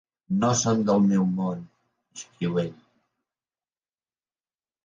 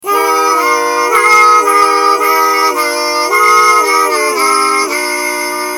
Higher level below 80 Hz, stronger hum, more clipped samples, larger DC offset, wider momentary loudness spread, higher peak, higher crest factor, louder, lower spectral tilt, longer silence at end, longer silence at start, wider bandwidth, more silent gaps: about the same, -62 dBFS vs -60 dBFS; neither; neither; neither; first, 20 LU vs 7 LU; second, -10 dBFS vs 0 dBFS; first, 16 dB vs 10 dB; second, -24 LUFS vs -9 LUFS; first, -5.5 dB/octave vs 0 dB/octave; first, 2.1 s vs 0 s; first, 0.3 s vs 0.05 s; second, 9.2 kHz vs 18 kHz; neither